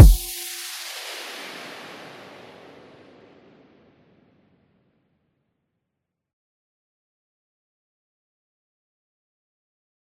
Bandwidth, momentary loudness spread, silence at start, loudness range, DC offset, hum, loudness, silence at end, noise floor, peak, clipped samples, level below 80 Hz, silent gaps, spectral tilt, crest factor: 16.5 kHz; 20 LU; 0 s; 21 LU; under 0.1%; none; -26 LUFS; 9.8 s; -82 dBFS; 0 dBFS; under 0.1%; -28 dBFS; none; -5 dB/octave; 26 dB